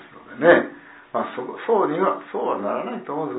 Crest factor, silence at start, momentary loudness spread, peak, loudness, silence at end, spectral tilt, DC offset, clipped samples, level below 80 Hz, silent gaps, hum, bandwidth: 22 dB; 0 s; 14 LU; -2 dBFS; -22 LUFS; 0 s; -10 dB/octave; under 0.1%; under 0.1%; -66 dBFS; none; none; 4 kHz